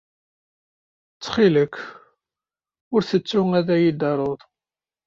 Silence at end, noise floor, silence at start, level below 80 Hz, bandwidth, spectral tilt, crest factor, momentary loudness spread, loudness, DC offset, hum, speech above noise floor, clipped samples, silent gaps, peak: 0.7 s; under -90 dBFS; 1.2 s; -60 dBFS; 7.6 kHz; -7 dB/octave; 18 dB; 17 LU; -21 LUFS; under 0.1%; none; over 70 dB; under 0.1%; 2.81-2.91 s; -4 dBFS